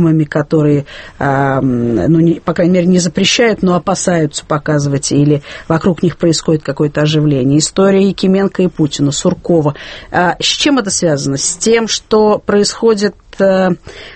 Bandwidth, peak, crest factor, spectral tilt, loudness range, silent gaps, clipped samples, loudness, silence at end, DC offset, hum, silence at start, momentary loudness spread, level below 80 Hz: 8.8 kHz; 0 dBFS; 12 dB; -5 dB/octave; 1 LU; none; under 0.1%; -12 LUFS; 0 s; under 0.1%; none; 0 s; 5 LU; -40 dBFS